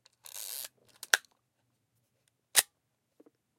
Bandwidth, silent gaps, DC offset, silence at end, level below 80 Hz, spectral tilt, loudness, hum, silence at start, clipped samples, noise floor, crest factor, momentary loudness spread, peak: 17 kHz; none; under 0.1%; 0.95 s; under -90 dBFS; 3 dB/octave; -30 LUFS; none; 0.25 s; under 0.1%; -80 dBFS; 36 dB; 19 LU; -2 dBFS